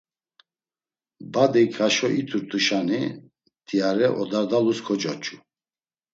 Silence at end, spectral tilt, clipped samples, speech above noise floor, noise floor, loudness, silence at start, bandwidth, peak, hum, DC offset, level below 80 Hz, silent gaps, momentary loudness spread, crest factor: 0.75 s; -4.5 dB/octave; under 0.1%; over 68 dB; under -90 dBFS; -23 LUFS; 1.2 s; 8 kHz; -4 dBFS; none; under 0.1%; -72 dBFS; none; 10 LU; 20 dB